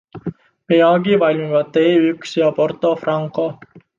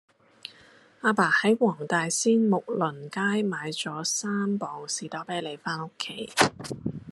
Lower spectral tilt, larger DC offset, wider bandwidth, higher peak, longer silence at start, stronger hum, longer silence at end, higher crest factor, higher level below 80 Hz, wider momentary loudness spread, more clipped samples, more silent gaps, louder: first, -7 dB/octave vs -3.5 dB/octave; neither; second, 7.4 kHz vs 13 kHz; about the same, -2 dBFS vs -4 dBFS; second, 0.15 s vs 0.45 s; neither; first, 0.2 s vs 0 s; second, 14 dB vs 24 dB; first, -62 dBFS vs -70 dBFS; about the same, 11 LU vs 13 LU; neither; neither; first, -16 LUFS vs -27 LUFS